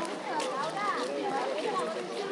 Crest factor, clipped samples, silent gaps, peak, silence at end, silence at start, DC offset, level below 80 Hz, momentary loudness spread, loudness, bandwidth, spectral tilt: 14 dB; under 0.1%; none; -18 dBFS; 0 s; 0 s; under 0.1%; under -90 dBFS; 3 LU; -32 LUFS; 11.5 kHz; -3.5 dB/octave